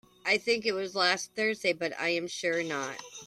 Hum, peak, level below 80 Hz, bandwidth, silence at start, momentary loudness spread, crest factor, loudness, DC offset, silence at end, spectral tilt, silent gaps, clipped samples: none; -12 dBFS; -76 dBFS; 14.5 kHz; 0.25 s; 5 LU; 20 dB; -29 LUFS; under 0.1%; 0 s; -2.5 dB/octave; none; under 0.1%